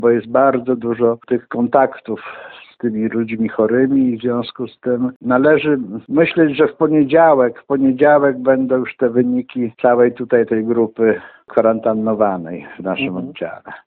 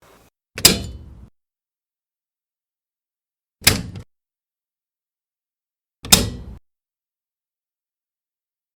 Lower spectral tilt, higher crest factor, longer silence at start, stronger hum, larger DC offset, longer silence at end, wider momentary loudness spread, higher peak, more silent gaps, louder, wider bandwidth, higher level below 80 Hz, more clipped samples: first, -10.5 dB/octave vs -2 dB/octave; second, 16 dB vs 26 dB; second, 0 s vs 0.55 s; neither; neither; second, 0.1 s vs 2.2 s; second, 12 LU vs 23 LU; about the same, 0 dBFS vs 0 dBFS; first, 5.16-5.20 s vs none; about the same, -16 LUFS vs -16 LUFS; second, 4.5 kHz vs over 20 kHz; second, -58 dBFS vs -42 dBFS; neither